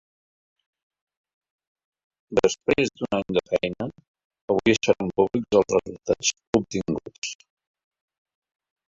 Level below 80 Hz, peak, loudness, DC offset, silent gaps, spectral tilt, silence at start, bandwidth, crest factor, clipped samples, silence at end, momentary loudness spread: -54 dBFS; -4 dBFS; -24 LUFS; under 0.1%; 4.08-4.14 s, 4.24-4.30 s, 4.42-4.48 s, 6.47-6.53 s, 7.18-7.22 s; -4 dB/octave; 2.3 s; 7.8 kHz; 22 dB; under 0.1%; 1.55 s; 13 LU